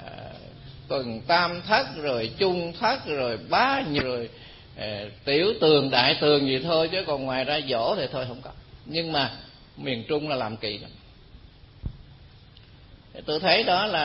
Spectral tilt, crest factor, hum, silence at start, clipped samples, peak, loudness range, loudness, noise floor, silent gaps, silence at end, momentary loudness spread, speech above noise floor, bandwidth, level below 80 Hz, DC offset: -8.5 dB/octave; 24 dB; none; 0 s; under 0.1%; -2 dBFS; 10 LU; -24 LUFS; -50 dBFS; none; 0 s; 20 LU; 25 dB; 5.8 kHz; -52 dBFS; under 0.1%